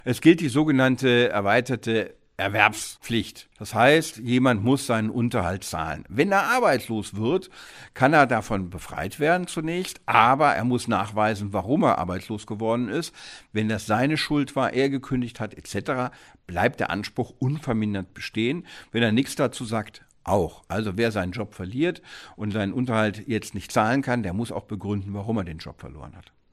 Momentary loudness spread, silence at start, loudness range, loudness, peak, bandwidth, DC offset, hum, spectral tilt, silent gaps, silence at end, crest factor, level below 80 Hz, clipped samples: 13 LU; 0.05 s; 5 LU; -24 LUFS; 0 dBFS; 15.5 kHz; under 0.1%; none; -5.5 dB/octave; none; 0.3 s; 24 dB; -52 dBFS; under 0.1%